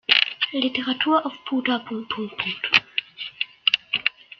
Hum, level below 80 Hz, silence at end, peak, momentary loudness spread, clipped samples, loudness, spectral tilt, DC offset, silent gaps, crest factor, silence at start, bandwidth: none; -70 dBFS; 0.3 s; 0 dBFS; 10 LU; under 0.1%; -22 LUFS; -3.5 dB/octave; under 0.1%; none; 24 dB; 0.1 s; 6.8 kHz